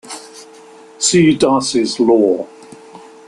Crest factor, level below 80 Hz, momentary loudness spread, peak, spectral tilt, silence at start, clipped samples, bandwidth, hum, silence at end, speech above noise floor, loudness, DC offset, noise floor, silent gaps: 16 dB; -54 dBFS; 20 LU; 0 dBFS; -4 dB/octave; 0.05 s; under 0.1%; 11.5 kHz; none; 0.3 s; 27 dB; -13 LUFS; under 0.1%; -40 dBFS; none